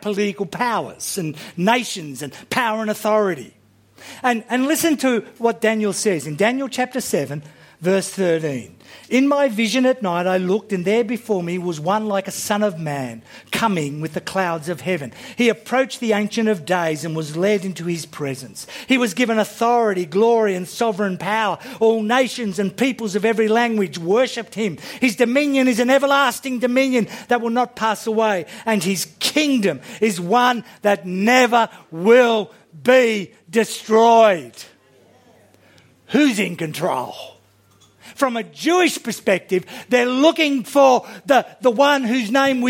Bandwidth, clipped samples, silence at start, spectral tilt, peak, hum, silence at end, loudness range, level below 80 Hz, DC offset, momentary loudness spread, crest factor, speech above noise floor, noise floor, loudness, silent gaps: 16.5 kHz; under 0.1%; 0 s; -4.5 dB/octave; 0 dBFS; none; 0 s; 5 LU; -68 dBFS; under 0.1%; 10 LU; 18 dB; 36 dB; -54 dBFS; -19 LUFS; none